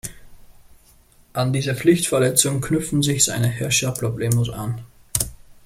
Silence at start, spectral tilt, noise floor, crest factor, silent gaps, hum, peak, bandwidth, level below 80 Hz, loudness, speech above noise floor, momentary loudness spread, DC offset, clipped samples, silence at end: 0.05 s; -4 dB/octave; -53 dBFS; 22 dB; none; none; 0 dBFS; 16.5 kHz; -46 dBFS; -20 LUFS; 33 dB; 12 LU; under 0.1%; under 0.1%; 0.1 s